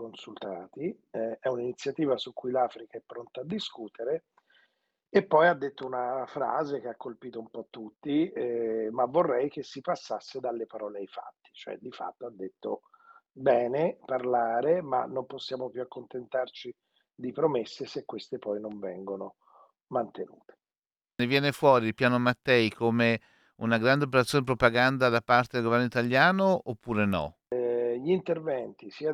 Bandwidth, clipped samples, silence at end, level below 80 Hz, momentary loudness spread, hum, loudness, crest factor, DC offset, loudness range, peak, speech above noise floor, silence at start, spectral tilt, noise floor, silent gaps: 15 kHz; under 0.1%; 0 s; -64 dBFS; 17 LU; none; -28 LUFS; 22 dB; under 0.1%; 10 LU; -6 dBFS; over 61 dB; 0 s; -6 dB/octave; under -90 dBFS; 20.78-20.82 s